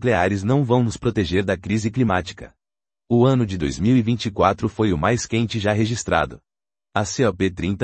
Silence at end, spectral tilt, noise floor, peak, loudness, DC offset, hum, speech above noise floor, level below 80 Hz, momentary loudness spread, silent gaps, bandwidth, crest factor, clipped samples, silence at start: 0 s; -6 dB/octave; -81 dBFS; -2 dBFS; -21 LUFS; under 0.1%; none; 61 dB; -44 dBFS; 6 LU; none; 8.8 kHz; 20 dB; under 0.1%; 0 s